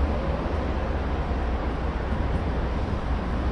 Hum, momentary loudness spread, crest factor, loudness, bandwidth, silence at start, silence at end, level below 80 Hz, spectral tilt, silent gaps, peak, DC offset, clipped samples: none; 1 LU; 12 dB; -28 LUFS; 6.6 kHz; 0 s; 0 s; -28 dBFS; -8 dB/octave; none; -14 dBFS; under 0.1%; under 0.1%